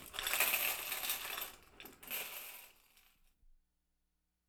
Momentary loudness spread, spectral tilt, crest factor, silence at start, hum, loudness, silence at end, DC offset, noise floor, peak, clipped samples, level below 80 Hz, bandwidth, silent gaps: 22 LU; 1 dB/octave; 26 dB; 0 s; 60 Hz at -85 dBFS; -37 LUFS; 0.95 s; under 0.1%; -84 dBFS; -16 dBFS; under 0.1%; -68 dBFS; over 20 kHz; none